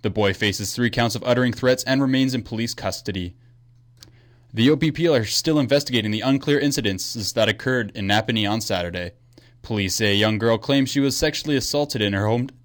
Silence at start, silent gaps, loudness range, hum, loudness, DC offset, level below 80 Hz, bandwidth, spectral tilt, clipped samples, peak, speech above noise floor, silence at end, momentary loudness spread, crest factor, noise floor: 0.05 s; none; 3 LU; none; -21 LUFS; under 0.1%; -48 dBFS; 19 kHz; -4.5 dB/octave; under 0.1%; -8 dBFS; 31 dB; 0.15 s; 8 LU; 14 dB; -52 dBFS